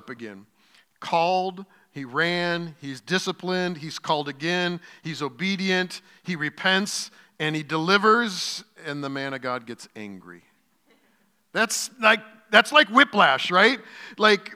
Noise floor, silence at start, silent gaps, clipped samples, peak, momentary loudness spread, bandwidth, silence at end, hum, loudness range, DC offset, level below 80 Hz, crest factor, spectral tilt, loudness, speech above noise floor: -66 dBFS; 0.05 s; none; under 0.1%; 0 dBFS; 20 LU; 16 kHz; 0 s; none; 8 LU; under 0.1%; -82 dBFS; 24 dB; -3.5 dB/octave; -23 LUFS; 42 dB